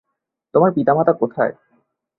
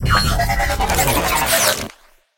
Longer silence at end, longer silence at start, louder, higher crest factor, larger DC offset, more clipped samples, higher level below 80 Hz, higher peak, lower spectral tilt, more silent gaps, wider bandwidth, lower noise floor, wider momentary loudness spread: first, 0.7 s vs 0.45 s; first, 0.55 s vs 0 s; about the same, -18 LUFS vs -16 LUFS; about the same, 18 dB vs 18 dB; neither; neither; second, -62 dBFS vs -26 dBFS; about the same, -2 dBFS vs 0 dBFS; first, -12.5 dB/octave vs -3 dB/octave; neither; second, 4.1 kHz vs 17 kHz; first, -78 dBFS vs -45 dBFS; about the same, 7 LU vs 5 LU